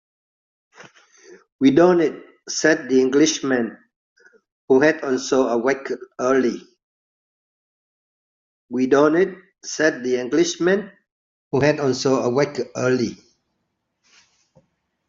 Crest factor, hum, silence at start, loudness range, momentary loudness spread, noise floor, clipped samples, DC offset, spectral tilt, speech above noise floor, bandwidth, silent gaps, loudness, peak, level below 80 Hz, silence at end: 18 dB; none; 0.8 s; 5 LU; 12 LU; -75 dBFS; under 0.1%; under 0.1%; -4.5 dB/octave; 56 dB; 7.6 kHz; 1.52-1.59 s, 3.96-4.16 s, 4.52-4.68 s, 6.83-8.68 s, 11.12-11.51 s; -19 LUFS; -2 dBFS; -62 dBFS; 1.95 s